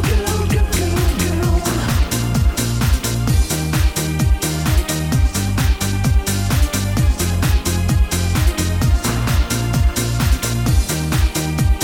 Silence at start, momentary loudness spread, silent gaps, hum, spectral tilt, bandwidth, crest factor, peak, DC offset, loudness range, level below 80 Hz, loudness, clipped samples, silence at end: 0 s; 1 LU; none; none; -5 dB/octave; 17 kHz; 12 dB; -4 dBFS; under 0.1%; 0 LU; -20 dBFS; -18 LUFS; under 0.1%; 0 s